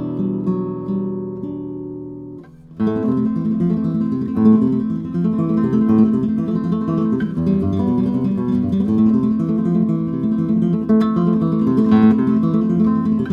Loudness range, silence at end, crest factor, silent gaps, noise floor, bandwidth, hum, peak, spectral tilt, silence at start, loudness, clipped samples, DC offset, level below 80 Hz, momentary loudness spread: 6 LU; 0 s; 14 dB; none; -37 dBFS; 4.9 kHz; none; -2 dBFS; -10.5 dB/octave; 0 s; -18 LUFS; under 0.1%; under 0.1%; -48 dBFS; 9 LU